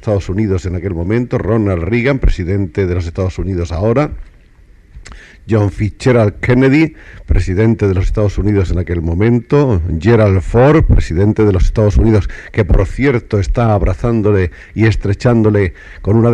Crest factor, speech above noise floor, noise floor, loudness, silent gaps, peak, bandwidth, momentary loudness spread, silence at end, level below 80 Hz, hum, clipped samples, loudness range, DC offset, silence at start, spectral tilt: 12 dB; 31 dB; -43 dBFS; -14 LUFS; none; 0 dBFS; 9.2 kHz; 7 LU; 0 s; -20 dBFS; none; under 0.1%; 5 LU; under 0.1%; 0 s; -8.5 dB/octave